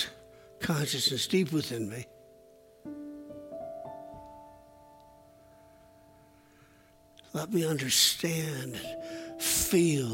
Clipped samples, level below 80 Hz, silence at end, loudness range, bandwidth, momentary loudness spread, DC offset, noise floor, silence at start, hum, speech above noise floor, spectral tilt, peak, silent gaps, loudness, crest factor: under 0.1%; -60 dBFS; 0 s; 19 LU; 16.5 kHz; 21 LU; under 0.1%; -60 dBFS; 0 s; none; 31 dB; -3.5 dB/octave; -12 dBFS; none; -29 LUFS; 22 dB